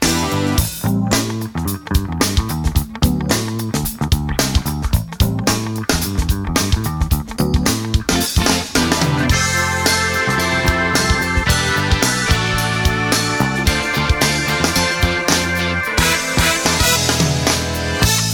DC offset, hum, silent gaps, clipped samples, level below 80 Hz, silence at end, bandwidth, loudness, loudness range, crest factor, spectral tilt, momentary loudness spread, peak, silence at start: under 0.1%; none; none; under 0.1%; -24 dBFS; 0 s; over 20 kHz; -16 LUFS; 4 LU; 16 dB; -3.5 dB/octave; 5 LU; 0 dBFS; 0 s